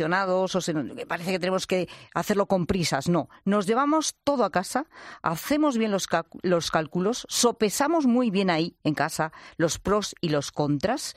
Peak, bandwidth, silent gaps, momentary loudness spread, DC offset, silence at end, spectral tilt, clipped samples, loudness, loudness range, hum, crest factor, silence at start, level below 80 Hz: -8 dBFS; 16 kHz; none; 7 LU; under 0.1%; 0.05 s; -4.5 dB/octave; under 0.1%; -25 LUFS; 2 LU; none; 18 dB; 0 s; -54 dBFS